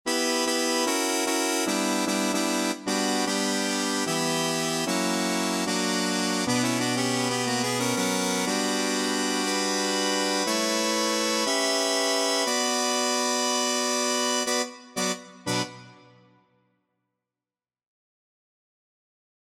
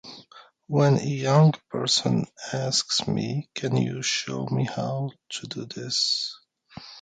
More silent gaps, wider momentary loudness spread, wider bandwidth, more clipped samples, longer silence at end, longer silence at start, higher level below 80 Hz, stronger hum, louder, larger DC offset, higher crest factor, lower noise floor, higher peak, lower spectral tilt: neither; second, 3 LU vs 13 LU; first, 16.5 kHz vs 9.4 kHz; neither; first, 3.5 s vs 0 s; about the same, 0.05 s vs 0.05 s; second, -70 dBFS vs -64 dBFS; neither; about the same, -25 LUFS vs -25 LUFS; neither; about the same, 14 dB vs 18 dB; first, under -90 dBFS vs -52 dBFS; second, -12 dBFS vs -8 dBFS; second, -2.5 dB/octave vs -4.5 dB/octave